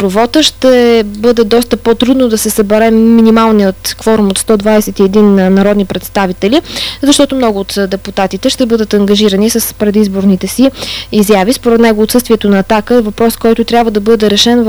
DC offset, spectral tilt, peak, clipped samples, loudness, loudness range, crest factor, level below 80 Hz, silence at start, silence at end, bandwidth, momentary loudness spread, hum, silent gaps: under 0.1%; -4.5 dB/octave; 0 dBFS; 2%; -9 LUFS; 3 LU; 8 dB; -34 dBFS; 0 s; 0 s; over 20 kHz; 6 LU; none; none